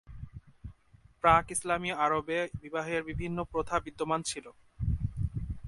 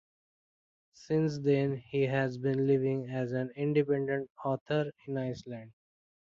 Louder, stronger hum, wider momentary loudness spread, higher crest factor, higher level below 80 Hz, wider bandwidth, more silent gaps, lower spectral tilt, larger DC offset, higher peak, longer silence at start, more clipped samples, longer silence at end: about the same, -31 LUFS vs -32 LUFS; neither; first, 22 LU vs 8 LU; first, 24 dB vs 16 dB; first, -44 dBFS vs -70 dBFS; first, 11.5 kHz vs 7.4 kHz; second, none vs 4.30-4.35 s, 4.61-4.66 s; second, -4.5 dB/octave vs -8 dB/octave; neither; first, -8 dBFS vs -16 dBFS; second, 0.1 s vs 1 s; neither; second, 0 s vs 0.7 s